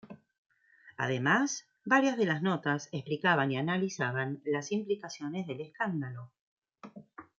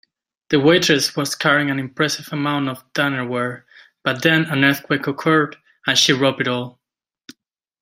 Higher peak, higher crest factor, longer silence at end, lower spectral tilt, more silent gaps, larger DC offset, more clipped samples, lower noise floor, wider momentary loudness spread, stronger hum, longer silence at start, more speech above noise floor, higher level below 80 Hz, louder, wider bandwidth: second, -12 dBFS vs 0 dBFS; about the same, 20 dB vs 18 dB; second, 0.15 s vs 1.1 s; about the same, -5 dB/octave vs -4 dB/octave; first, 0.38-0.45 s, 6.41-6.62 s vs none; neither; neither; second, -59 dBFS vs -74 dBFS; about the same, 13 LU vs 11 LU; neither; second, 0.05 s vs 0.5 s; second, 28 dB vs 55 dB; second, -78 dBFS vs -62 dBFS; second, -31 LUFS vs -18 LUFS; second, 7.8 kHz vs 16 kHz